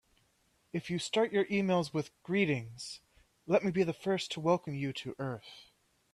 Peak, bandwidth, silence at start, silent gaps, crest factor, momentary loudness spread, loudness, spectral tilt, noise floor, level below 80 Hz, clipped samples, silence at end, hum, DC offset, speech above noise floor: -14 dBFS; 12.5 kHz; 0.75 s; none; 20 dB; 14 LU; -33 LUFS; -5.5 dB/octave; -73 dBFS; -70 dBFS; under 0.1%; 0.5 s; none; under 0.1%; 40 dB